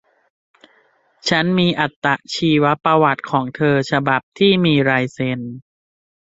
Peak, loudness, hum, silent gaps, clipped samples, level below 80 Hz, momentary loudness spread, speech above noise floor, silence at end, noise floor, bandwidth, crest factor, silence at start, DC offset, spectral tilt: -2 dBFS; -17 LUFS; none; 1.96-2.02 s, 4.23-4.32 s; under 0.1%; -56 dBFS; 8 LU; 41 dB; 0.8 s; -58 dBFS; 8 kHz; 18 dB; 1.25 s; under 0.1%; -6 dB/octave